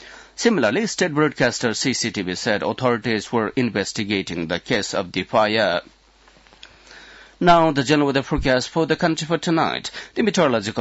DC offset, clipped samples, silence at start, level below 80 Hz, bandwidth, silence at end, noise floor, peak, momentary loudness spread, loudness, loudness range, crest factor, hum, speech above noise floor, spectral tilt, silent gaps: under 0.1%; under 0.1%; 0 s; -44 dBFS; 8 kHz; 0 s; -53 dBFS; -4 dBFS; 6 LU; -20 LUFS; 3 LU; 16 dB; none; 33 dB; -4.5 dB/octave; none